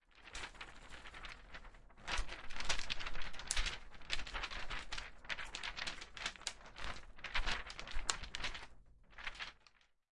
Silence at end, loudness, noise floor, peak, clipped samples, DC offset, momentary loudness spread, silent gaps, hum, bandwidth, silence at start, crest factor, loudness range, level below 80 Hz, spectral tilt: 0.65 s; -44 LUFS; -70 dBFS; -14 dBFS; under 0.1%; under 0.1%; 13 LU; none; none; 11.5 kHz; 0.15 s; 28 dB; 2 LU; -50 dBFS; -1 dB/octave